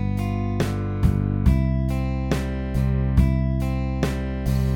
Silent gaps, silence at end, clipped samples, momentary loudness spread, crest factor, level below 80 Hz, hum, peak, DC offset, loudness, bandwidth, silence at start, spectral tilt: none; 0 s; under 0.1%; 5 LU; 16 dB; -26 dBFS; none; -6 dBFS; under 0.1%; -23 LUFS; 16 kHz; 0 s; -8 dB/octave